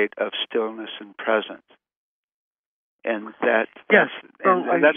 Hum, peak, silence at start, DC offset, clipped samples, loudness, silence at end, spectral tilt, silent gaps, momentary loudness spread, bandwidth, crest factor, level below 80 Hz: none; -2 dBFS; 0 s; under 0.1%; under 0.1%; -22 LUFS; 0 s; -8 dB/octave; 1.96-2.99 s; 14 LU; 3.7 kHz; 22 dB; -80 dBFS